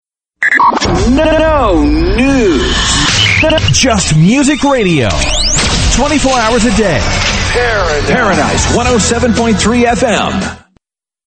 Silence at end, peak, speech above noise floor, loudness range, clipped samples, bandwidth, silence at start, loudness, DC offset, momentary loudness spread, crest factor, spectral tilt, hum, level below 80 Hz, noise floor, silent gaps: 0.7 s; 0 dBFS; 47 dB; 2 LU; under 0.1%; 9.2 kHz; 0.4 s; -10 LUFS; under 0.1%; 3 LU; 10 dB; -4 dB/octave; none; -20 dBFS; -57 dBFS; none